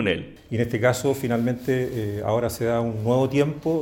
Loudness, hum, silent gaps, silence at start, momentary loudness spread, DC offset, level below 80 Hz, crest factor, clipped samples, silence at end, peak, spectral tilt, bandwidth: -24 LUFS; none; none; 0 s; 6 LU; under 0.1%; -50 dBFS; 16 dB; under 0.1%; 0 s; -6 dBFS; -6.5 dB/octave; 17 kHz